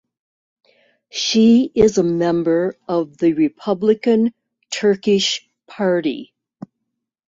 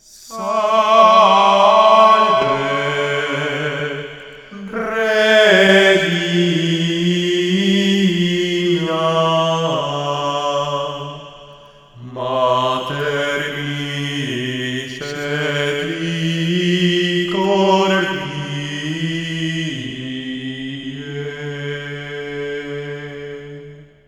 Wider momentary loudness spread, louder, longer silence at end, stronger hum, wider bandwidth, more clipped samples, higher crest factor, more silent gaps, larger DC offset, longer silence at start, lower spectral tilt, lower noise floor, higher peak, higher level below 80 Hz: second, 9 LU vs 17 LU; about the same, -17 LUFS vs -16 LUFS; first, 1.05 s vs 0.25 s; neither; second, 7.8 kHz vs 14.5 kHz; neither; about the same, 16 dB vs 18 dB; neither; neither; first, 1.15 s vs 0.15 s; about the same, -5 dB/octave vs -5 dB/octave; first, -78 dBFS vs -43 dBFS; about the same, -2 dBFS vs 0 dBFS; about the same, -52 dBFS vs -54 dBFS